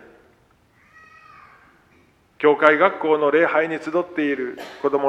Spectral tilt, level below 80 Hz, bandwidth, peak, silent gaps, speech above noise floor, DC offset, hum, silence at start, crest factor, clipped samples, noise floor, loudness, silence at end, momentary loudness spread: -6 dB/octave; -68 dBFS; 8.2 kHz; 0 dBFS; none; 39 dB; under 0.1%; none; 2.4 s; 22 dB; under 0.1%; -58 dBFS; -19 LUFS; 0 s; 10 LU